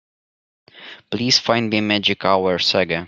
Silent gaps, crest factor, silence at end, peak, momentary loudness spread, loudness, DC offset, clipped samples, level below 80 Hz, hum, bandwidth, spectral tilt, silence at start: none; 18 dB; 0 s; -2 dBFS; 13 LU; -17 LUFS; under 0.1%; under 0.1%; -60 dBFS; none; 11 kHz; -3.5 dB/octave; 0.75 s